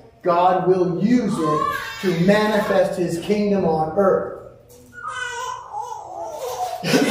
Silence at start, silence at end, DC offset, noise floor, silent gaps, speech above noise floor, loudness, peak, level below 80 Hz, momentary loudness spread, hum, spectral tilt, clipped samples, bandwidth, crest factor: 0.25 s; 0 s; under 0.1%; -45 dBFS; none; 26 dB; -20 LUFS; -2 dBFS; -52 dBFS; 14 LU; none; -6 dB/octave; under 0.1%; 16 kHz; 18 dB